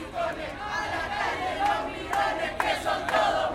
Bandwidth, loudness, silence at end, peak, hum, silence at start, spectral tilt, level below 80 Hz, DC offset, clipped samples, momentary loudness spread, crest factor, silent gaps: 16.5 kHz; -28 LUFS; 0 s; -8 dBFS; none; 0 s; -3.5 dB/octave; -50 dBFS; under 0.1%; under 0.1%; 7 LU; 20 dB; none